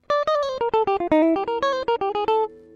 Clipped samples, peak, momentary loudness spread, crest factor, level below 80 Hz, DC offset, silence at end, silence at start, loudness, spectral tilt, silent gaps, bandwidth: under 0.1%; -8 dBFS; 4 LU; 14 dB; -54 dBFS; under 0.1%; 0.15 s; 0.1 s; -22 LUFS; -5 dB/octave; none; 7.6 kHz